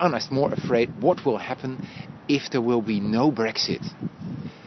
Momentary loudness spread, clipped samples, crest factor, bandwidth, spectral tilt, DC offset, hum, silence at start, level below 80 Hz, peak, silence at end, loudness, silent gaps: 13 LU; under 0.1%; 20 dB; 6.2 kHz; -6 dB/octave; under 0.1%; none; 0 s; -62 dBFS; -4 dBFS; 0 s; -24 LUFS; none